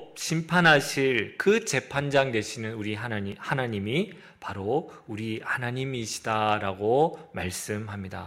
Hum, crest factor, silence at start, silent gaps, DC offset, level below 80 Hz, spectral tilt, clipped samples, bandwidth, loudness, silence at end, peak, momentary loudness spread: none; 22 dB; 0 s; none; under 0.1%; -62 dBFS; -4.5 dB/octave; under 0.1%; 16 kHz; -27 LUFS; 0 s; -6 dBFS; 12 LU